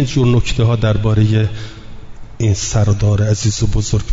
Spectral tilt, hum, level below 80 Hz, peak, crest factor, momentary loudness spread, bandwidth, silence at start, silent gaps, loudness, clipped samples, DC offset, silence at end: -6 dB/octave; none; -26 dBFS; -2 dBFS; 12 dB; 6 LU; 7.8 kHz; 0 s; none; -15 LUFS; under 0.1%; under 0.1%; 0 s